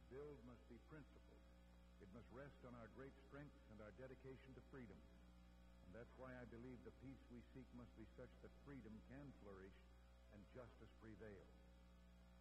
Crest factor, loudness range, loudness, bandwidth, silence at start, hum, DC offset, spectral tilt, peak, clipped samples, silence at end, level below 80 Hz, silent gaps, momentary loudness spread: 16 dB; 2 LU; -63 LUFS; 9.6 kHz; 0 s; 60 Hz at -70 dBFS; under 0.1%; -7.5 dB/octave; -46 dBFS; under 0.1%; 0 s; -70 dBFS; none; 8 LU